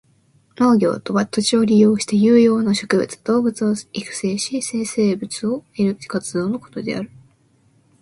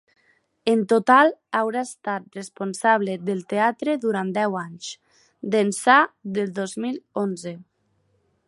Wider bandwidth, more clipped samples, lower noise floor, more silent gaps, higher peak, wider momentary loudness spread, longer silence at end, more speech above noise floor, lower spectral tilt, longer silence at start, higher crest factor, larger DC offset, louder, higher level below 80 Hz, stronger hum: about the same, 11.5 kHz vs 11.5 kHz; neither; second, -58 dBFS vs -68 dBFS; neither; about the same, -2 dBFS vs -2 dBFS; second, 12 LU vs 17 LU; about the same, 0.95 s vs 0.85 s; second, 40 dB vs 46 dB; about the same, -5 dB/octave vs -4.5 dB/octave; about the same, 0.6 s vs 0.65 s; about the same, 18 dB vs 22 dB; neither; first, -19 LUFS vs -22 LUFS; first, -60 dBFS vs -74 dBFS; neither